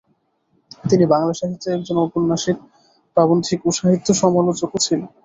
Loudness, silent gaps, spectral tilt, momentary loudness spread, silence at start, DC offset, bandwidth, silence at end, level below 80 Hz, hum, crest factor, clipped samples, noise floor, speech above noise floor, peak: -18 LUFS; none; -5.5 dB/octave; 8 LU; 0.85 s; under 0.1%; 8.2 kHz; 0.2 s; -56 dBFS; none; 16 dB; under 0.1%; -65 dBFS; 47 dB; -2 dBFS